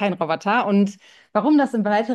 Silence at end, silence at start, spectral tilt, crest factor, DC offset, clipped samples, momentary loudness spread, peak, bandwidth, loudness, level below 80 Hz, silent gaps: 0 s; 0 s; -7 dB/octave; 14 dB; under 0.1%; under 0.1%; 6 LU; -6 dBFS; 9.4 kHz; -20 LUFS; -70 dBFS; none